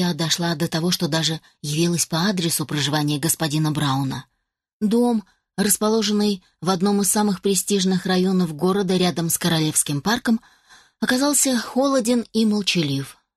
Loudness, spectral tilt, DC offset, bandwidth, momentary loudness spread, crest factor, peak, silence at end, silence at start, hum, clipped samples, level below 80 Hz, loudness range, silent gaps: -20 LUFS; -4 dB/octave; under 0.1%; 13 kHz; 6 LU; 16 dB; -6 dBFS; 0.25 s; 0 s; none; under 0.1%; -58 dBFS; 2 LU; 4.73-4.80 s